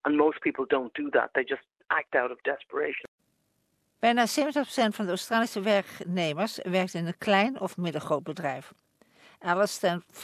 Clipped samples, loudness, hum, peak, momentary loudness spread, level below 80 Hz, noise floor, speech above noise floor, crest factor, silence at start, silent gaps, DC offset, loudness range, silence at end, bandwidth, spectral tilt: under 0.1%; -28 LUFS; none; -8 dBFS; 9 LU; -74 dBFS; -74 dBFS; 46 dB; 20 dB; 0.05 s; 3.08-3.18 s; under 0.1%; 2 LU; 0 s; 14.5 kHz; -4.5 dB/octave